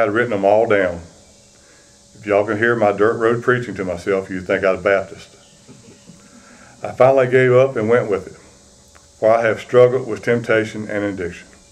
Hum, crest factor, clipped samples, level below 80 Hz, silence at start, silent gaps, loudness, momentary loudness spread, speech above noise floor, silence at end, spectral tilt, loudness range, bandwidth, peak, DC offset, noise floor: none; 18 dB; under 0.1%; -54 dBFS; 0 s; none; -17 LUFS; 13 LU; 32 dB; 0.3 s; -6.5 dB/octave; 4 LU; 10.5 kHz; 0 dBFS; under 0.1%; -48 dBFS